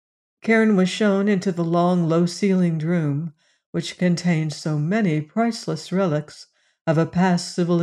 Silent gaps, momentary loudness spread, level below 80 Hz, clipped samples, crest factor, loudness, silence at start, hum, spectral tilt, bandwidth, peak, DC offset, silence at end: 3.66-3.73 s, 6.81-6.85 s; 10 LU; -64 dBFS; under 0.1%; 16 dB; -21 LUFS; 0.45 s; none; -6.5 dB/octave; 11 kHz; -6 dBFS; under 0.1%; 0 s